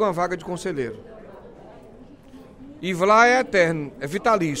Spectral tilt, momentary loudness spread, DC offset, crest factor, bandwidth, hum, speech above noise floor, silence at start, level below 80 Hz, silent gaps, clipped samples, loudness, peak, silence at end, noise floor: -5 dB/octave; 17 LU; under 0.1%; 20 dB; 15.5 kHz; none; 25 dB; 0 s; -52 dBFS; none; under 0.1%; -21 LUFS; -2 dBFS; 0 s; -45 dBFS